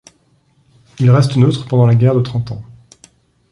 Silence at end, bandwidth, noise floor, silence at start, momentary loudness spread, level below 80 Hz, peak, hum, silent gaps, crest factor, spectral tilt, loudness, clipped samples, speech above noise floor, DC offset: 0.9 s; 11 kHz; -56 dBFS; 1 s; 12 LU; -48 dBFS; -2 dBFS; none; none; 14 dB; -8 dB/octave; -13 LUFS; under 0.1%; 44 dB; under 0.1%